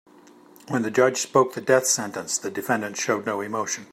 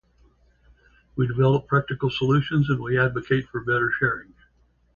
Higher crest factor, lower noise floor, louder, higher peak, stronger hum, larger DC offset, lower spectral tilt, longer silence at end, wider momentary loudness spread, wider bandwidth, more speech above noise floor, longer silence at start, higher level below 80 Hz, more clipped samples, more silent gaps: about the same, 20 dB vs 18 dB; second, -51 dBFS vs -62 dBFS; about the same, -23 LUFS vs -23 LUFS; about the same, -4 dBFS vs -6 dBFS; neither; neither; second, -3 dB/octave vs -8 dB/octave; second, 0.05 s vs 0.75 s; about the same, 8 LU vs 6 LU; first, 16 kHz vs 7 kHz; second, 27 dB vs 40 dB; second, 0.65 s vs 1.15 s; second, -74 dBFS vs -52 dBFS; neither; neither